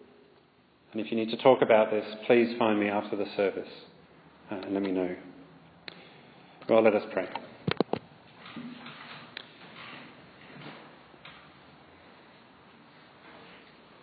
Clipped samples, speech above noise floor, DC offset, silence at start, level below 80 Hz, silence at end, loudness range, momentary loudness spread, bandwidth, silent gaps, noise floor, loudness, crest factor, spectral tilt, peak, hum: under 0.1%; 36 dB; under 0.1%; 0.95 s; -76 dBFS; 0.45 s; 22 LU; 27 LU; 5 kHz; none; -62 dBFS; -28 LUFS; 24 dB; -9.5 dB/octave; -8 dBFS; none